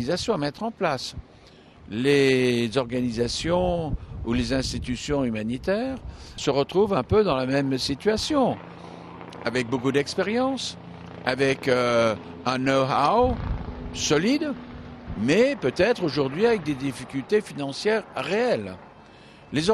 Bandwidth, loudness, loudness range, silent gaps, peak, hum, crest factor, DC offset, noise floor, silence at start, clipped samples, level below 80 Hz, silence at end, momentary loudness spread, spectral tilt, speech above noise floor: 13 kHz; -24 LUFS; 3 LU; none; -4 dBFS; none; 20 dB; under 0.1%; -50 dBFS; 0 s; under 0.1%; -42 dBFS; 0 s; 14 LU; -5 dB/octave; 26 dB